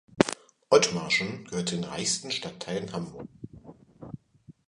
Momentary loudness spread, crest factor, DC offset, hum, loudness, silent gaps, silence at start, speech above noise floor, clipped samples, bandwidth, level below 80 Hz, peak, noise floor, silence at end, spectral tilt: 23 LU; 26 dB; under 0.1%; none; -28 LUFS; none; 0.15 s; 27 dB; under 0.1%; 11.5 kHz; -62 dBFS; -2 dBFS; -56 dBFS; 0.15 s; -3.5 dB/octave